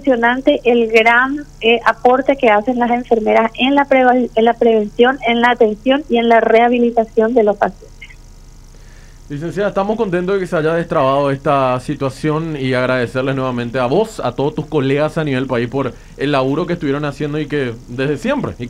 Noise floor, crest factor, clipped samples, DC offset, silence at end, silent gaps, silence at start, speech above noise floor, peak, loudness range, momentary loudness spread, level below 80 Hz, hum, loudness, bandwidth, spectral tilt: -38 dBFS; 14 dB; under 0.1%; under 0.1%; 0 s; none; 0 s; 23 dB; 0 dBFS; 6 LU; 8 LU; -40 dBFS; none; -15 LUFS; 11.5 kHz; -6.5 dB/octave